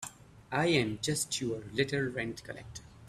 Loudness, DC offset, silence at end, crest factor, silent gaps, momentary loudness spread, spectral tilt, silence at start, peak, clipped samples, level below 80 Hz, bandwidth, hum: -32 LUFS; under 0.1%; 0 s; 20 dB; none; 16 LU; -4 dB/octave; 0 s; -14 dBFS; under 0.1%; -60 dBFS; 14.5 kHz; none